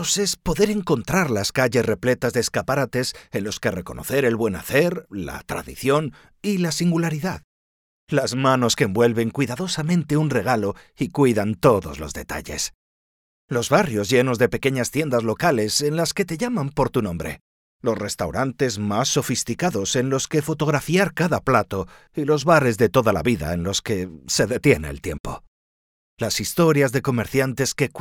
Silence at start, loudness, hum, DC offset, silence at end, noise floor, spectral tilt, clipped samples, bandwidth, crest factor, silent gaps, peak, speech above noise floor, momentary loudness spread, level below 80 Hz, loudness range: 0 s; -22 LUFS; none; under 0.1%; 0 s; under -90 dBFS; -4.5 dB/octave; under 0.1%; 18.5 kHz; 18 dB; 7.44-8.07 s, 12.75-13.48 s, 17.41-17.80 s, 25.20-25.24 s, 25.48-26.17 s; -2 dBFS; over 69 dB; 11 LU; -46 dBFS; 3 LU